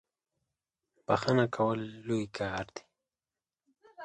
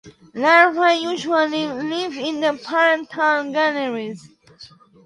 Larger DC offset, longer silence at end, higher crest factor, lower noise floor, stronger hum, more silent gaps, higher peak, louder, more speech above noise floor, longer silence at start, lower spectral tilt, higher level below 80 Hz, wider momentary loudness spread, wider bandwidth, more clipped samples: neither; second, 0 s vs 0.4 s; about the same, 22 dB vs 20 dB; first, under -90 dBFS vs -46 dBFS; neither; neither; second, -12 dBFS vs 0 dBFS; second, -32 LUFS vs -19 LUFS; first, over 59 dB vs 27 dB; first, 1.1 s vs 0.05 s; first, -6.5 dB/octave vs -3.5 dB/octave; about the same, -64 dBFS vs -68 dBFS; first, 17 LU vs 12 LU; second, 9.6 kHz vs 11 kHz; neither